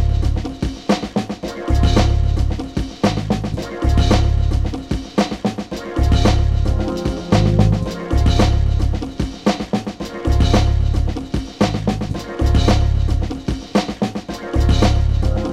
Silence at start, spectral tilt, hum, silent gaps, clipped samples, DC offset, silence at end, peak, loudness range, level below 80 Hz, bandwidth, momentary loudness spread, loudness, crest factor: 0 s; -6.5 dB/octave; none; none; under 0.1%; under 0.1%; 0 s; 0 dBFS; 2 LU; -20 dBFS; 11 kHz; 9 LU; -19 LUFS; 16 dB